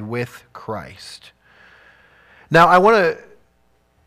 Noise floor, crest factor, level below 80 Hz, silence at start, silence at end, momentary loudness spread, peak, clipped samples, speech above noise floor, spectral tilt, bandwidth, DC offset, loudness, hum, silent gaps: -61 dBFS; 16 dB; -54 dBFS; 0 s; 0.9 s; 25 LU; -2 dBFS; under 0.1%; 44 dB; -5.5 dB/octave; 15.5 kHz; under 0.1%; -14 LUFS; none; none